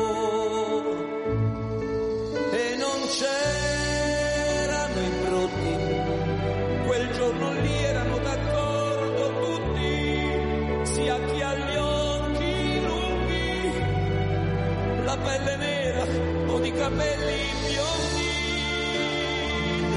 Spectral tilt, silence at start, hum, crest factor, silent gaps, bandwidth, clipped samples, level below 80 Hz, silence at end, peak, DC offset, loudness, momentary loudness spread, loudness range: -5 dB/octave; 0 s; none; 12 dB; none; 11.5 kHz; under 0.1%; -38 dBFS; 0 s; -12 dBFS; under 0.1%; -26 LUFS; 2 LU; 1 LU